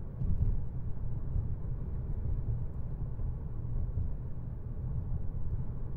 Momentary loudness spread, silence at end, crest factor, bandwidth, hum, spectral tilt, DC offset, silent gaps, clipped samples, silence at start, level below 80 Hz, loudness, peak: 6 LU; 0 s; 16 dB; 2 kHz; none; -12.5 dB/octave; under 0.1%; none; under 0.1%; 0 s; -36 dBFS; -38 LUFS; -16 dBFS